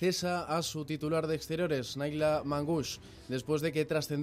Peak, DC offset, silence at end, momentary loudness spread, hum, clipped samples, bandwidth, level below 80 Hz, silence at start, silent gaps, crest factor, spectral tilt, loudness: -18 dBFS; under 0.1%; 0 s; 6 LU; none; under 0.1%; 16 kHz; -60 dBFS; 0 s; none; 14 dB; -5 dB/octave; -33 LUFS